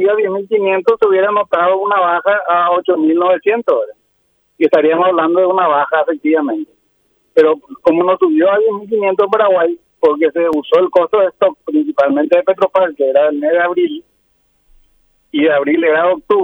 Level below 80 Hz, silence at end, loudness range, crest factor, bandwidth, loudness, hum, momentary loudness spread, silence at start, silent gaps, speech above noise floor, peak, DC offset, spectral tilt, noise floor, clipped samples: -62 dBFS; 0 s; 2 LU; 12 dB; 5.4 kHz; -13 LUFS; none; 5 LU; 0 s; none; 49 dB; 0 dBFS; under 0.1%; -7 dB/octave; -61 dBFS; under 0.1%